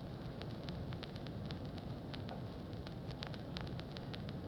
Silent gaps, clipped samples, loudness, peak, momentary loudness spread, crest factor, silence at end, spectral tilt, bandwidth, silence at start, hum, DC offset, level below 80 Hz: none; under 0.1%; -46 LUFS; -22 dBFS; 2 LU; 24 dB; 0 s; -7 dB/octave; 19 kHz; 0 s; none; under 0.1%; -56 dBFS